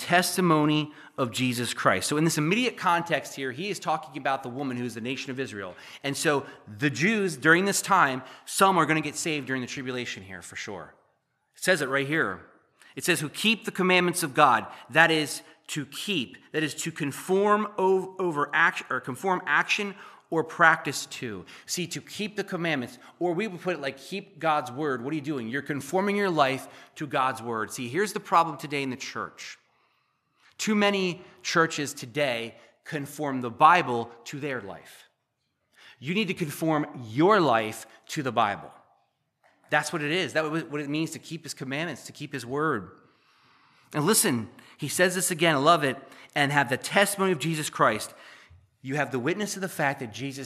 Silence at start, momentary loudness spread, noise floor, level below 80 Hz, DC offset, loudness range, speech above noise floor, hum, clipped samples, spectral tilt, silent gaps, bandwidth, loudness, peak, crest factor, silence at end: 0 s; 15 LU; -78 dBFS; -76 dBFS; under 0.1%; 6 LU; 51 dB; none; under 0.1%; -4 dB/octave; none; 15 kHz; -26 LUFS; -2 dBFS; 26 dB; 0 s